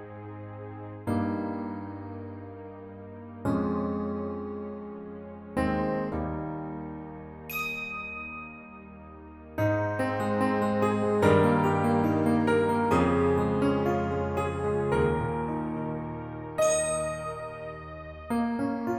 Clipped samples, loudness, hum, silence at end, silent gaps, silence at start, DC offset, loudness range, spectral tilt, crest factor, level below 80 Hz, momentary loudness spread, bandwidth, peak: under 0.1%; -28 LUFS; none; 0 s; none; 0 s; under 0.1%; 10 LU; -6.5 dB/octave; 20 dB; -50 dBFS; 18 LU; 16.5 kHz; -8 dBFS